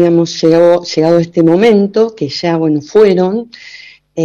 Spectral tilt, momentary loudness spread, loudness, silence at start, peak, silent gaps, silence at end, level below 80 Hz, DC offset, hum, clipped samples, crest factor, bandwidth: -6.5 dB/octave; 10 LU; -11 LUFS; 0 s; 0 dBFS; none; 0 s; -54 dBFS; under 0.1%; none; under 0.1%; 10 dB; 7.4 kHz